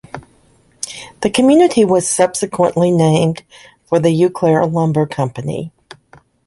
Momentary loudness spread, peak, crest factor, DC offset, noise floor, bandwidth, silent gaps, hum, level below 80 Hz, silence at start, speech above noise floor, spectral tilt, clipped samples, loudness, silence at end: 16 LU; -2 dBFS; 14 dB; under 0.1%; -52 dBFS; 11.5 kHz; none; none; -52 dBFS; 0.15 s; 39 dB; -5.5 dB/octave; under 0.1%; -14 LUFS; 0.8 s